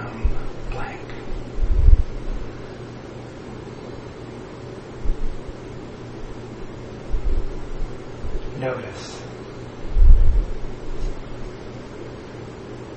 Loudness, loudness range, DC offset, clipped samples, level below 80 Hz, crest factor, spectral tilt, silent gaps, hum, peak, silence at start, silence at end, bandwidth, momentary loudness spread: -29 LUFS; 9 LU; under 0.1%; under 0.1%; -22 dBFS; 20 dB; -7 dB/octave; none; none; 0 dBFS; 0 s; 0 s; 7.6 kHz; 16 LU